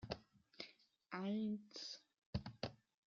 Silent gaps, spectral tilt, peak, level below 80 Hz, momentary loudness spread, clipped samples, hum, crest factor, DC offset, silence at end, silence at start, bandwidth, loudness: 2.18-2.33 s; -5 dB/octave; -26 dBFS; -68 dBFS; 13 LU; under 0.1%; none; 22 dB; under 0.1%; 0.3 s; 0 s; 7.4 kHz; -49 LUFS